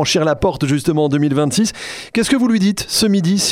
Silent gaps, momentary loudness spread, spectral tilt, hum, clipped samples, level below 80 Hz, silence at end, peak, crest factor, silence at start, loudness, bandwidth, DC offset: none; 5 LU; -4.5 dB/octave; none; under 0.1%; -42 dBFS; 0 s; -2 dBFS; 14 dB; 0 s; -16 LUFS; 16.5 kHz; under 0.1%